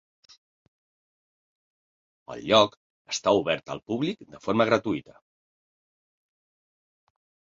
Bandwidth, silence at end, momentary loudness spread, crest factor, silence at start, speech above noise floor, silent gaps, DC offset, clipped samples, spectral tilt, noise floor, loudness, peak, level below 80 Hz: 7.8 kHz; 2.55 s; 13 LU; 24 dB; 2.3 s; over 65 dB; 2.77-3.05 s; under 0.1%; under 0.1%; -4.5 dB/octave; under -90 dBFS; -25 LUFS; -6 dBFS; -66 dBFS